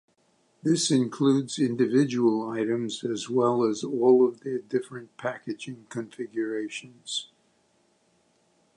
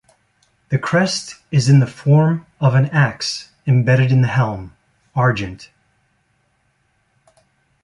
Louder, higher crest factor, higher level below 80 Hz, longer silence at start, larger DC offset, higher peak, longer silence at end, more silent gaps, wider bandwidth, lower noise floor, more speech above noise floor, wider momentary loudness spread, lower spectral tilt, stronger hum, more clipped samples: second, -26 LUFS vs -17 LUFS; about the same, 18 dB vs 16 dB; second, -78 dBFS vs -50 dBFS; about the same, 0.65 s vs 0.7 s; neither; second, -8 dBFS vs -2 dBFS; second, 1.5 s vs 2.2 s; neither; about the same, 11.5 kHz vs 11 kHz; about the same, -67 dBFS vs -64 dBFS; second, 41 dB vs 48 dB; first, 14 LU vs 11 LU; about the same, -5 dB/octave vs -6 dB/octave; neither; neither